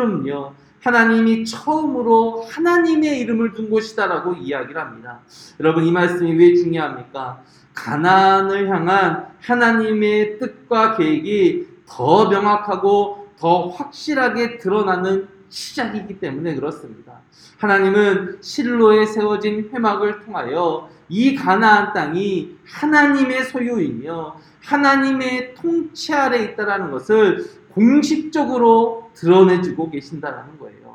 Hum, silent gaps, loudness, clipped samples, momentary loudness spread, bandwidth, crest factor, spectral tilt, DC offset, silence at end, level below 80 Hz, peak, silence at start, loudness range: none; none; -17 LUFS; under 0.1%; 15 LU; 12 kHz; 18 dB; -6 dB/octave; under 0.1%; 0.05 s; -62 dBFS; 0 dBFS; 0 s; 4 LU